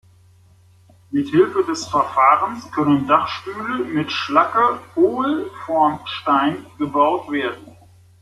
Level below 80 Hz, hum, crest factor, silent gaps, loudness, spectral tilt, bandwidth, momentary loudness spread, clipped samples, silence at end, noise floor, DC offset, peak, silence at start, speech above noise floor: -60 dBFS; none; 18 dB; none; -19 LUFS; -5.5 dB/octave; 12.5 kHz; 10 LU; under 0.1%; 0.5 s; -51 dBFS; under 0.1%; -2 dBFS; 1.1 s; 33 dB